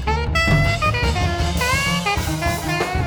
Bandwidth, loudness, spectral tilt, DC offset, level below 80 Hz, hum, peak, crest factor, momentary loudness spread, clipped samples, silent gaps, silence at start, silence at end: over 20 kHz; -19 LUFS; -4.5 dB/octave; under 0.1%; -26 dBFS; none; -4 dBFS; 14 dB; 5 LU; under 0.1%; none; 0 s; 0 s